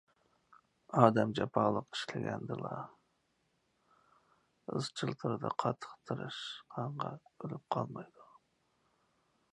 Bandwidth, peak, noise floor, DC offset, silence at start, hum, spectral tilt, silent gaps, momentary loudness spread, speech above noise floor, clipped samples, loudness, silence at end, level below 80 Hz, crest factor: 11 kHz; -8 dBFS; -78 dBFS; under 0.1%; 0.9 s; none; -6.5 dB/octave; none; 17 LU; 43 dB; under 0.1%; -36 LUFS; 1.3 s; -74 dBFS; 30 dB